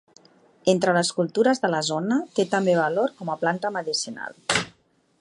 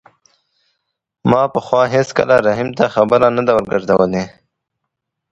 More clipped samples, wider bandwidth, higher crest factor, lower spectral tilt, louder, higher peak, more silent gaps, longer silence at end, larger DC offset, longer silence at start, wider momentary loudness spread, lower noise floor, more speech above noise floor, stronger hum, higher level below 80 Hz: neither; first, 11.5 kHz vs 8.2 kHz; about the same, 20 dB vs 16 dB; second, -4 dB/octave vs -6.5 dB/octave; second, -24 LUFS vs -15 LUFS; second, -4 dBFS vs 0 dBFS; neither; second, 0.5 s vs 1.05 s; neither; second, 0.65 s vs 1.25 s; about the same, 6 LU vs 5 LU; second, -62 dBFS vs -77 dBFS; second, 39 dB vs 63 dB; neither; second, -64 dBFS vs -50 dBFS